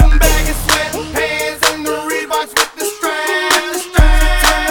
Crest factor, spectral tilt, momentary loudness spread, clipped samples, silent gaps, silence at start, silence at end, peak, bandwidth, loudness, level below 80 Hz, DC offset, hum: 12 dB; -3 dB/octave; 6 LU; under 0.1%; none; 0 s; 0 s; 0 dBFS; 19.5 kHz; -14 LUFS; -16 dBFS; under 0.1%; none